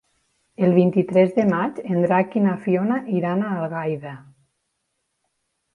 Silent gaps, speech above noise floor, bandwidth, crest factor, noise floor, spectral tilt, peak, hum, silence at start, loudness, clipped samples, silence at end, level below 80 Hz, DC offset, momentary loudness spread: none; 55 dB; 6 kHz; 18 dB; -75 dBFS; -9.5 dB/octave; -4 dBFS; none; 0.6 s; -21 LUFS; under 0.1%; 1.55 s; -66 dBFS; under 0.1%; 9 LU